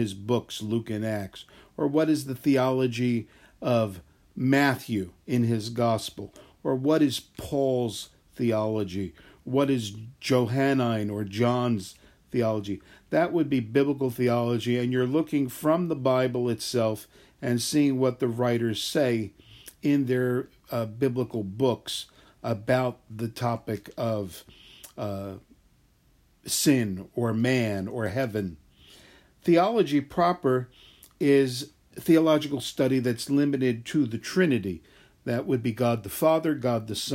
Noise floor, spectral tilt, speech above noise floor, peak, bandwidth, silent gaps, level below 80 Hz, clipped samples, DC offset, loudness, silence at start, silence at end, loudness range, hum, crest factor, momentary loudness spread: -63 dBFS; -6 dB/octave; 37 dB; -8 dBFS; 16 kHz; none; -62 dBFS; under 0.1%; under 0.1%; -26 LUFS; 0 s; 0 s; 4 LU; none; 18 dB; 13 LU